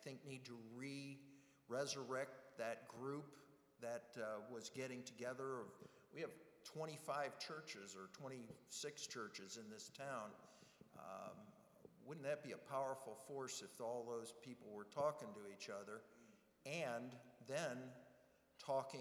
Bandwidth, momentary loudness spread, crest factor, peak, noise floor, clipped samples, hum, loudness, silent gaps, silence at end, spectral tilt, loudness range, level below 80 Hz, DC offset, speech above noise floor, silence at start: over 20 kHz; 15 LU; 22 dB; -30 dBFS; -73 dBFS; under 0.1%; none; -51 LUFS; none; 0 s; -4 dB/octave; 4 LU; under -90 dBFS; under 0.1%; 23 dB; 0 s